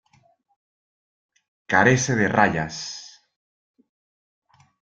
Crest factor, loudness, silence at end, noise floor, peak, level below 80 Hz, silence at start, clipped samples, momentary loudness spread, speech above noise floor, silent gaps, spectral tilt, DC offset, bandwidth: 24 dB; -20 LUFS; 1.95 s; -62 dBFS; -2 dBFS; -58 dBFS; 1.7 s; under 0.1%; 16 LU; 42 dB; none; -4.5 dB/octave; under 0.1%; 9.2 kHz